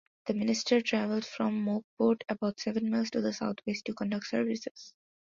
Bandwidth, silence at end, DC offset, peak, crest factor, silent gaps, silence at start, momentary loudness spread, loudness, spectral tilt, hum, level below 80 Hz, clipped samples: 7.6 kHz; 0.3 s; under 0.1%; -12 dBFS; 20 dB; 1.84-1.97 s, 4.71-4.75 s; 0.25 s; 8 LU; -31 LUFS; -5 dB/octave; none; -72 dBFS; under 0.1%